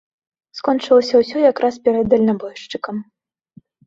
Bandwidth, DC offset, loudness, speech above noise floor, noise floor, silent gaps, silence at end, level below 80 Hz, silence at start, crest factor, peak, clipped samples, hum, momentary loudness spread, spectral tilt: 7.6 kHz; under 0.1%; -17 LUFS; 34 dB; -50 dBFS; none; 0.85 s; -56 dBFS; 0.55 s; 16 dB; -2 dBFS; under 0.1%; none; 15 LU; -6 dB/octave